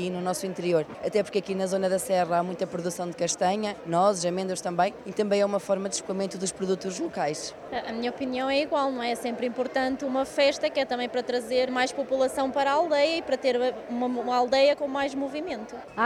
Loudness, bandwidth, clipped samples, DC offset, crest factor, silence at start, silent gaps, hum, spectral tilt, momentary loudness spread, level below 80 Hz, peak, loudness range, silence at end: -27 LUFS; 14 kHz; under 0.1%; under 0.1%; 16 dB; 0 s; none; none; -4 dB/octave; 7 LU; -64 dBFS; -10 dBFS; 4 LU; 0 s